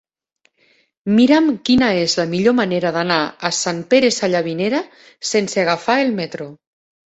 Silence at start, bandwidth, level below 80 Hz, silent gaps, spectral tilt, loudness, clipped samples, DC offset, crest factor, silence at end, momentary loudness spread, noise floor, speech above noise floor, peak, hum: 1.05 s; 8.2 kHz; -54 dBFS; none; -4 dB/octave; -17 LUFS; under 0.1%; under 0.1%; 16 dB; 0.65 s; 11 LU; -64 dBFS; 47 dB; -2 dBFS; none